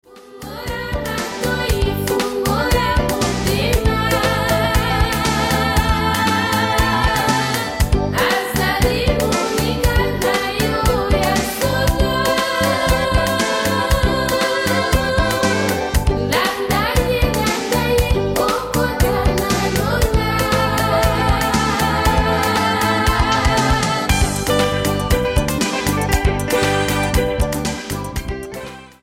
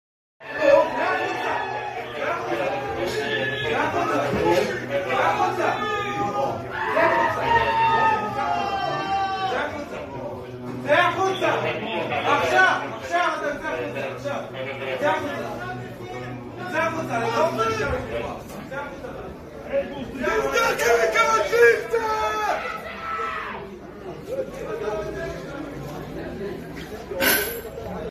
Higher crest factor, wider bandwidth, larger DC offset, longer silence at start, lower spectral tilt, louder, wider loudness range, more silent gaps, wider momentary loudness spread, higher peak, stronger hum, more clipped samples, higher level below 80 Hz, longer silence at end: second, 14 dB vs 20 dB; first, 17 kHz vs 15 kHz; neither; second, 0.1 s vs 0.4 s; about the same, -4.5 dB/octave vs -4 dB/octave; first, -17 LUFS vs -23 LUFS; second, 2 LU vs 7 LU; neither; second, 3 LU vs 15 LU; about the same, -4 dBFS vs -4 dBFS; neither; neither; first, -24 dBFS vs -48 dBFS; first, 0.15 s vs 0 s